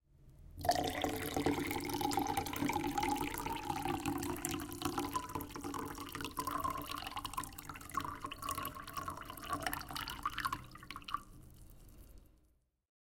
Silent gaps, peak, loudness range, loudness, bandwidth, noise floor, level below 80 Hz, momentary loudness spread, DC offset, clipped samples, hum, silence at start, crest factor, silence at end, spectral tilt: none; -14 dBFS; 6 LU; -40 LUFS; 17 kHz; -74 dBFS; -56 dBFS; 10 LU; under 0.1%; under 0.1%; none; 0.15 s; 26 dB; 0.75 s; -4 dB/octave